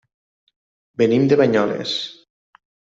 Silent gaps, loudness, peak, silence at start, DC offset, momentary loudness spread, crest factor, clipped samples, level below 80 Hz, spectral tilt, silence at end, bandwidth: none; -18 LUFS; -4 dBFS; 1 s; under 0.1%; 15 LU; 18 dB; under 0.1%; -64 dBFS; -6 dB/octave; 0.85 s; 7.8 kHz